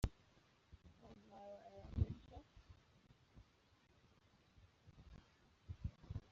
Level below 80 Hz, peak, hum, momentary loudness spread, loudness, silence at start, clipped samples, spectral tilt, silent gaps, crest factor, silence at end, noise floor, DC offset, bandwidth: -56 dBFS; -24 dBFS; none; 24 LU; -50 LUFS; 0 s; under 0.1%; -8 dB/octave; none; 26 dB; 0 s; -74 dBFS; under 0.1%; 7.4 kHz